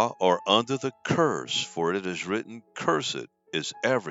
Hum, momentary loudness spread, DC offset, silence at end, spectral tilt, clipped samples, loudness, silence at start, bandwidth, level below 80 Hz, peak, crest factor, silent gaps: none; 9 LU; under 0.1%; 0 s; -4 dB/octave; under 0.1%; -27 LUFS; 0 s; 8 kHz; -70 dBFS; -4 dBFS; 22 dB; none